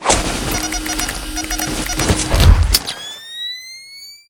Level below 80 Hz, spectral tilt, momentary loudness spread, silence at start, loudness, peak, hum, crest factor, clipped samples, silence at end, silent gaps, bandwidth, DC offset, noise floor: -20 dBFS; -3.5 dB/octave; 15 LU; 0 s; -17 LUFS; 0 dBFS; none; 18 dB; 0.1%; 0.15 s; none; 19 kHz; under 0.1%; -38 dBFS